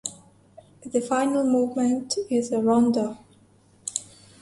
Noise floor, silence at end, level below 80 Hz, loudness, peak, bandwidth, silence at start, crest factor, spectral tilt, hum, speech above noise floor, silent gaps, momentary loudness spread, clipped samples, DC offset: -57 dBFS; 0.4 s; -66 dBFS; -24 LUFS; -6 dBFS; 11.5 kHz; 0.05 s; 20 dB; -4.5 dB/octave; none; 35 dB; none; 14 LU; under 0.1%; under 0.1%